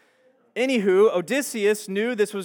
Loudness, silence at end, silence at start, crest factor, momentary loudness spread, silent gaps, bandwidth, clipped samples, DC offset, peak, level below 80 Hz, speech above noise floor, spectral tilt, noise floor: -22 LUFS; 0 s; 0.55 s; 14 dB; 8 LU; none; 18.5 kHz; under 0.1%; under 0.1%; -8 dBFS; under -90 dBFS; 39 dB; -4.5 dB/octave; -61 dBFS